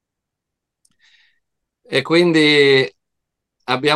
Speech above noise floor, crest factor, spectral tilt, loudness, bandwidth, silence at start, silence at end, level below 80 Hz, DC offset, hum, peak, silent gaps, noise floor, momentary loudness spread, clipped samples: 67 dB; 18 dB; -5 dB/octave; -15 LUFS; 12 kHz; 1.9 s; 0 s; -68 dBFS; under 0.1%; none; 0 dBFS; none; -81 dBFS; 12 LU; under 0.1%